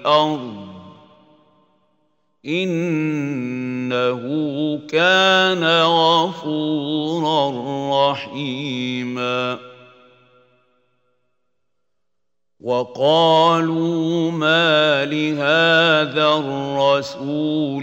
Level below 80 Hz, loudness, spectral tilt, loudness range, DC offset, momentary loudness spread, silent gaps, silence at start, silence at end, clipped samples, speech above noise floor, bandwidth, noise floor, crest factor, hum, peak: -70 dBFS; -18 LUFS; -5 dB/octave; 11 LU; under 0.1%; 11 LU; none; 0 s; 0 s; under 0.1%; 63 dB; 16 kHz; -81 dBFS; 18 dB; none; -2 dBFS